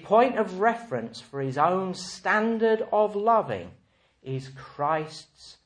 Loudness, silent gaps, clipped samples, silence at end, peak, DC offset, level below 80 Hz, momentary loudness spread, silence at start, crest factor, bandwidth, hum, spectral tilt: -26 LUFS; none; under 0.1%; 0.15 s; -8 dBFS; under 0.1%; -68 dBFS; 14 LU; 0 s; 18 dB; 10 kHz; none; -5.5 dB/octave